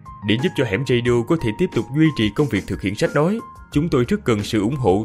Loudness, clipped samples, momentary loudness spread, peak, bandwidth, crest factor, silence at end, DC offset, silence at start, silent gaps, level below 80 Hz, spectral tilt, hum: -20 LUFS; under 0.1%; 4 LU; -4 dBFS; 15 kHz; 16 dB; 0 s; under 0.1%; 0.05 s; none; -42 dBFS; -6.5 dB/octave; none